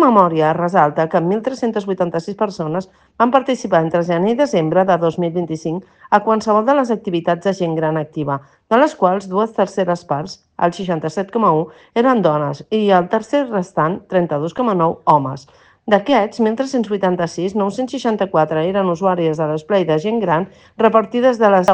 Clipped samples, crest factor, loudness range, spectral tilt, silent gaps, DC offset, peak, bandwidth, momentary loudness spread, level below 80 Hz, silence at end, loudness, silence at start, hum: under 0.1%; 16 dB; 2 LU; -7 dB/octave; none; under 0.1%; 0 dBFS; 9.4 kHz; 7 LU; -58 dBFS; 0 s; -17 LUFS; 0 s; none